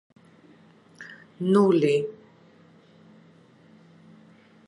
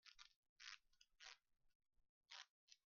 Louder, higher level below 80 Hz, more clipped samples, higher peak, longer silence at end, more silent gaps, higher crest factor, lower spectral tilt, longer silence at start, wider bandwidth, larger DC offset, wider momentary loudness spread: first, -23 LUFS vs -63 LUFS; first, -76 dBFS vs under -90 dBFS; neither; first, -8 dBFS vs -40 dBFS; first, 2.55 s vs 0.15 s; second, none vs 0.36-0.43 s, 0.49-0.56 s, 1.75-1.80 s, 2.09-2.21 s, 2.49-2.67 s; second, 20 dB vs 28 dB; first, -7.5 dB/octave vs 5.5 dB/octave; first, 1 s vs 0.05 s; first, 11 kHz vs 7 kHz; neither; first, 25 LU vs 8 LU